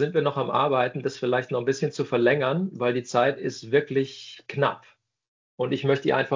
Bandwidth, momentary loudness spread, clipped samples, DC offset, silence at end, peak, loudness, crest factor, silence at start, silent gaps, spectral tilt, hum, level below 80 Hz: 7.6 kHz; 8 LU; under 0.1%; under 0.1%; 0 s; -8 dBFS; -25 LUFS; 18 dB; 0 s; 5.28-5.58 s; -6 dB/octave; none; -70 dBFS